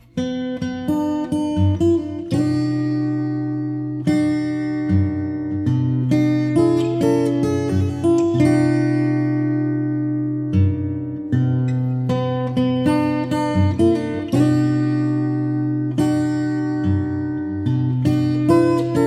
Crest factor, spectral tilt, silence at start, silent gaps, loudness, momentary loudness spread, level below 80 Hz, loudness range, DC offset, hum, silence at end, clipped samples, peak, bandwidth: 14 dB; -8 dB/octave; 0.15 s; none; -19 LUFS; 7 LU; -48 dBFS; 3 LU; under 0.1%; none; 0 s; under 0.1%; -4 dBFS; 12 kHz